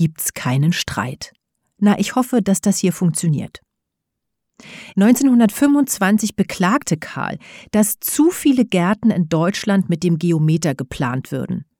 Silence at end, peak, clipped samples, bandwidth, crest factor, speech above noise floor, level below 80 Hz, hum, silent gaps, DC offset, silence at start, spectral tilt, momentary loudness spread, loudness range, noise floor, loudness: 0.15 s; -2 dBFS; under 0.1%; 19.5 kHz; 16 dB; 61 dB; -52 dBFS; none; none; under 0.1%; 0 s; -5.5 dB/octave; 10 LU; 3 LU; -79 dBFS; -18 LUFS